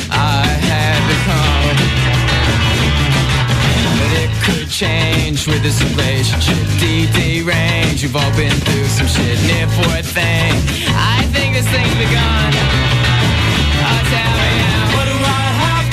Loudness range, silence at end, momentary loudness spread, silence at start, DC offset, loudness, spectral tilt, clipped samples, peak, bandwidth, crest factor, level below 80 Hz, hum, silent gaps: 1 LU; 0 s; 2 LU; 0 s; under 0.1%; -13 LUFS; -4.5 dB/octave; under 0.1%; -4 dBFS; 15.5 kHz; 10 dB; -22 dBFS; none; none